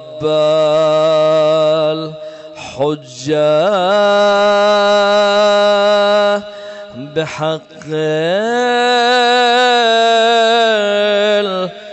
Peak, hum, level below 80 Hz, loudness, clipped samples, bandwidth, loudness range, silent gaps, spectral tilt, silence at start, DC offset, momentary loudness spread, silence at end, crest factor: -4 dBFS; none; -60 dBFS; -12 LUFS; under 0.1%; 8.4 kHz; 4 LU; none; -4 dB/octave; 0 s; under 0.1%; 12 LU; 0 s; 8 dB